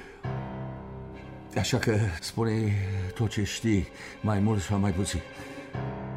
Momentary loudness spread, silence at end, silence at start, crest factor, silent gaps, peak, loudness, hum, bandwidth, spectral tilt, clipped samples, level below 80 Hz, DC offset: 14 LU; 0 s; 0 s; 16 dB; none; -12 dBFS; -29 LUFS; none; 15 kHz; -6 dB/octave; under 0.1%; -48 dBFS; under 0.1%